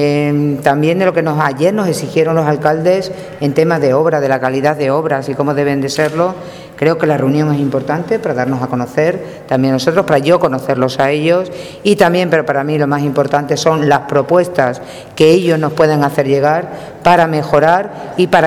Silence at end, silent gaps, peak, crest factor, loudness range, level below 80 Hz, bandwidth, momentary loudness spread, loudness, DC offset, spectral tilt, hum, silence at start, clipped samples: 0 s; none; 0 dBFS; 12 dB; 3 LU; -50 dBFS; 15.5 kHz; 6 LU; -13 LUFS; under 0.1%; -6.5 dB/octave; none; 0 s; 0.1%